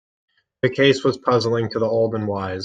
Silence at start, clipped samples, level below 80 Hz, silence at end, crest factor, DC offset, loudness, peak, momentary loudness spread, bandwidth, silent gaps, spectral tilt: 0.65 s; under 0.1%; -60 dBFS; 0 s; 18 dB; under 0.1%; -20 LUFS; -4 dBFS; 8 LU; 9.2 kHz; none; -6 dB/octave